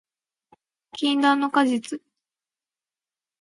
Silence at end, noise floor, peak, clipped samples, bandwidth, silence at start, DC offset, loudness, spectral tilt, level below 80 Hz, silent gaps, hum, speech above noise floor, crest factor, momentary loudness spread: 1.45 s; under -90 dBFS; -6 dBFS; under 0.1%; 11.5 kHz; 0.95 s; under 0.1%; -22 LUFS; -3 dB/octave; -78 dBFS; none; none; over 69 dB; 20 dB; 17 LU